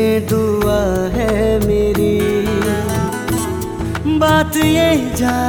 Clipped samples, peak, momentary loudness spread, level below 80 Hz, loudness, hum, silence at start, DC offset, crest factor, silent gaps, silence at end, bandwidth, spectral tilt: under 0.1%; -2 dBFS; 6 LU; -28 dBFS; -16 LUFS; none; 0 s; under 0.1%; 14 dB; none; 0 s; 19 kHz; -5.5 dB/octave